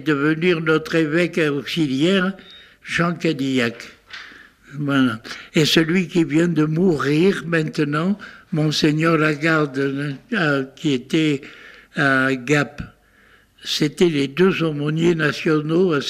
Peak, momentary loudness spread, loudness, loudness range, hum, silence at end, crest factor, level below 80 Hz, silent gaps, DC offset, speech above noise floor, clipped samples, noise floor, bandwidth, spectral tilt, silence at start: 0 dBFS; 11 LU; -19 LUFS; 3 LU; none; 0 s; 20 dB; -56 dBFS; none; under 0.1%; 34 dB; under 0.1%; -53 dBFS; 15.5 kHz; -5.5 dB/octave; 0 s